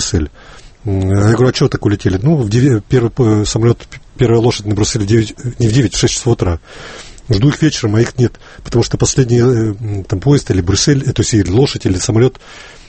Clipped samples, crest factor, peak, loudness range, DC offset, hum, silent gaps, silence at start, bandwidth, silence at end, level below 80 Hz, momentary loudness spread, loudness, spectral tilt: under 0.1%; 12 dB; 0 dBFS; 2 LU; under 0.1%; none; none; 0 s; 8.8 kHz; 0.15 s; -32 dBFS; 9 LU; -13 LUFS; -5.5 dB/octave